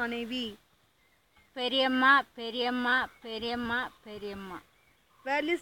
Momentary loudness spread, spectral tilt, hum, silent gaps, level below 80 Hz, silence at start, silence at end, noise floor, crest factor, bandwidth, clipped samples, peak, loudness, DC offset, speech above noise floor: 19 LU; -4 dB/octave; none; none; -64 dBFS; 0 s; 0 s; -68 dBFS; 22 dB; 17 kHz; under 0.1%; -10 dBFS; -29 LUFS; under 0.1%; 38 dB